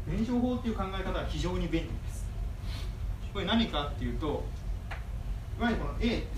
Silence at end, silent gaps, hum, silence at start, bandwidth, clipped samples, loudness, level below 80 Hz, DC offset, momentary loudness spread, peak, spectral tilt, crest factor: 0 s; none; none; 0 s; 14 kHz; under 0.1%; -34 LUFS; -36 dBFS; under 0.1%; 10 LU; -16 dBFS; -6.5 dB/octave; 16 dB